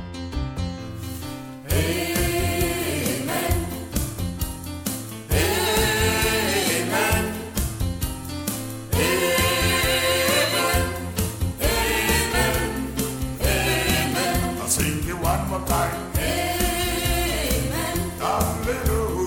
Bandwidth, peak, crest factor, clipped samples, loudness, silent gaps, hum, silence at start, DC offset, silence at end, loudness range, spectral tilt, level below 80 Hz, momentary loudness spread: 17.5 kHz; -6 dBFS; 18 dB; under 0.1%; -23 LUFS; none; none; 0 s; under 0.1%; 0 s; 4 LU; -3.5 dB/octave; -32 dBFS; 10 LU